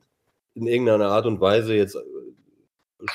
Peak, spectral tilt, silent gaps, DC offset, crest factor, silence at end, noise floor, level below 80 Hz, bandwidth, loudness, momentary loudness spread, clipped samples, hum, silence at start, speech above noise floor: -6 dBFS; -6.5 dB/octave; none; under 0.1%; 16 dB; 0 s; -74 dBFS; -68 dBFS; 15 kHz; -21 LUFS; 17 LU; under 0.1%; none; 0.55 s; 54 dB